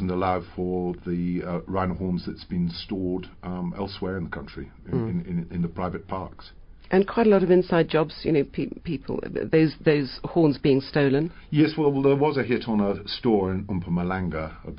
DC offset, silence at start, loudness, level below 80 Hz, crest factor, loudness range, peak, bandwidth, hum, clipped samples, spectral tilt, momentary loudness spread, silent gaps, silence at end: under 0.1%; 0 s; -25 LUFS; -46 dBFS; 16 dB; 8 LU; -8 dBFS; 5.4 kHz; none; under 0.1%; -11.5 dB/octave; 11 LU; none; 0 s